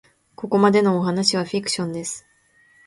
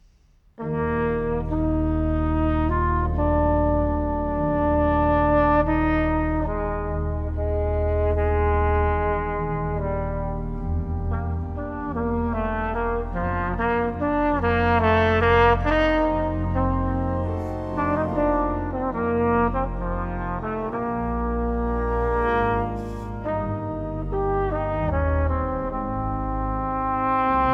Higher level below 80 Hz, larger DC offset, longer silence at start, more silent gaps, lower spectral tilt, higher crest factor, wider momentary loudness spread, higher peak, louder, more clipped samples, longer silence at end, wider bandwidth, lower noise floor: second, -64 dBFS vs -30 dBFS; neither; second, 0.4 s vs 0.6 s; neither; second, -4.5 dB/octave vs -9.5 dB/octave; about the same, 20 dB vs 16 dB; first, 15 LU vs 9 LU; first, -2 dBFS vs -6 dBFS; first, -20 LUFS vs -24 LUFS; neither; first, 0.65 s vs 0 s; first, 11.5 kHz vs 6 kHz; about the same, -57 dBFS vs -56 dBFS